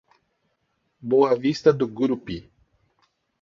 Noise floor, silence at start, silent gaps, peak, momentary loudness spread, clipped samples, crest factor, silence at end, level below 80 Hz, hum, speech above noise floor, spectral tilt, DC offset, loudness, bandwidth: -72 dBFS; 1.05 s; none; -6 dBFS; 17 LU; under 0.1%; 20 dB; 1 s; -58 dBFS; none; 51 dB; -7 dB/octave; under 0.1%; -22 LUFS; 7.4 kHz